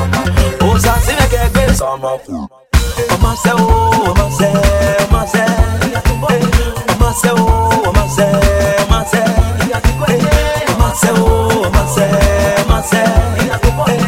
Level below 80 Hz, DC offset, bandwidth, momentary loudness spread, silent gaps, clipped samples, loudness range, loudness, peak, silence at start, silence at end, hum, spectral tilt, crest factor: -16 dBFS; under 0.1%; 17 kHz; 4 LU; none; under 0.1%; 1 LU; -12 LUFS; 0 dBFS; 0 s; 0 s; none; -5 dB/octave; 12 dB